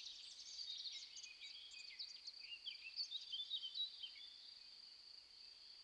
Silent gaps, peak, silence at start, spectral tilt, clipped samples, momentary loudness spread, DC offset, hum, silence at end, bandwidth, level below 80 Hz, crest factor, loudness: none; -36 dBFS; 0 s; 3 dB/octave; under 0.1%; 13 LU; under 0.1%; none; 0 s; 11.5 kHz; -90 dBFS; 18 dB; -50 LUFS